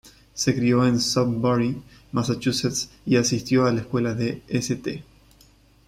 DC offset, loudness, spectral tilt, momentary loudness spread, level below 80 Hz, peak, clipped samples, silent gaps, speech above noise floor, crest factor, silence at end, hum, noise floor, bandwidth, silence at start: under 0.1%; -23 LUFS; -5 dB/octave; 9 LU; -52 dBFS; -6 dBFS; under 0.1%; none; 32 dB; 18 dB; 0.85 s; none; -55 dBFS; 15.5 kHz; 0.05 s